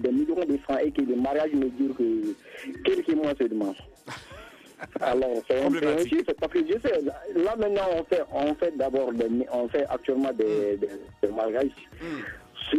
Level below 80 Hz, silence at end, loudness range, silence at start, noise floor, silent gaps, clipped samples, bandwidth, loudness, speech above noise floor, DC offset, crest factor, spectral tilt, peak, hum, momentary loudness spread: -56 dBFS; 0 s; 3 LU; 0 s; -47 dBFS; none; under 0.1%; 13.5 kHz; -27 LUFS; 20 dB; under 0.1%; 16 dB; -6 dB/octave; -10 dBFS; none; 13 LU